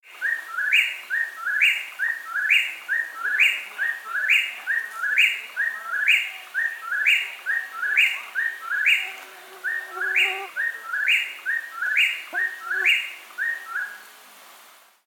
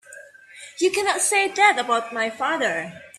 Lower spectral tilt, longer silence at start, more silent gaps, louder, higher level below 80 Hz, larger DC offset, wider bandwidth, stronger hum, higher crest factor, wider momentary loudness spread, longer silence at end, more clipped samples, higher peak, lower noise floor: second, 3.5 dB/octave vs -1 dB/octave; about the same, 0.05 s vs 0.1 s; neither; about the same, -22 LUFS vs -21 LUFS; second, under -90 dBFS vs -70 dBFS; neither; first, 17 kHz vs 13 kHz; neither; about the same, 18 dB vs 18 dB; about the same, 9 LU vs 11 LU; first, 0.4 s vs 0.1 s; neither; about the same, -6 dBFS vs -4 dBFS; first, -51 dBFS vs -45 dBFS